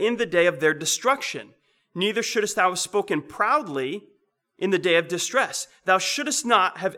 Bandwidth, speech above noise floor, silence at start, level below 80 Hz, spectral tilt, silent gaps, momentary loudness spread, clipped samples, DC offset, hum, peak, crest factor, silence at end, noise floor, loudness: 18 kHz; 39 dB; 0 s; -72 dBFS; -2.5 dB/octave; none; 9 LU; under 0.1%; under 0.1%; none; -6 dBFS; 18 dB; 0 s; -62 dBFS; -23 LUFS